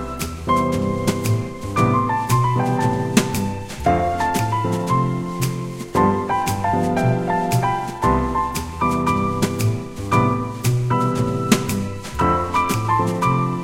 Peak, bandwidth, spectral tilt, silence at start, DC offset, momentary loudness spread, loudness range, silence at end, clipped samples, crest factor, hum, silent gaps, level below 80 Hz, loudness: 0 dBFS; 16.5 kHz; -6 dB/octave; 0 s; 0.2%; 5 LU; 1 LU; 0 s; under 0.1%; 20 dB; none; none; -38 dBFS; -20 LUFS